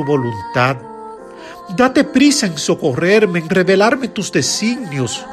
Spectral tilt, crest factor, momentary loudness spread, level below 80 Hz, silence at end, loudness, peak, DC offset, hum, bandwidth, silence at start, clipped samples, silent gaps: -4.5 dB/octave; 14 dB; 20 LU; -52 dBFS; 0 s; -15 LUFS; 0 dBFS; under 0.1%; none; 13.5 kHz; 0 s; under 0.1%; none